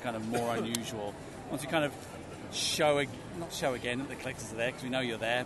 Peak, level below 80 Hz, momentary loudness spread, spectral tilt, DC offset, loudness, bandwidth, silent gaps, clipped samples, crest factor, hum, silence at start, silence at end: -14 dBFS; -60 dBFS; 13 LU; -3.5 dB/octave; under 0.1%; -33 LUFS; 12 kHz; none; under 0.1%; 20 dB; none; 0 s; 0 s